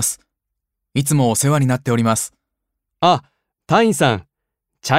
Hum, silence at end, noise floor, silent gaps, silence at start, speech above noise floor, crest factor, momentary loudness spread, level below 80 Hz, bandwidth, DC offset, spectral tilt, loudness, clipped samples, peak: none; 0 s; -79 dBFS; none; 0 s; 64 dB; 18 dB; 10 LU; -56 dBFS; 16 kHz; under 0.1%; -4.5 dB/octave; -17 LUFS; under 0.1%; 0 dBFS